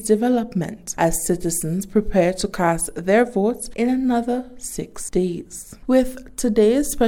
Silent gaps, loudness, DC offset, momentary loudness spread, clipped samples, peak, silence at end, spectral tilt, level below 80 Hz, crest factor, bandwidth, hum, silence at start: none; -21 LUFS; under 0.1%; 11 LU; under 0.1%; -4 dBFS; 0 s; -5 dB/octave; -38 dBFS; 16 dB; 17.5 kHz; none; 0 s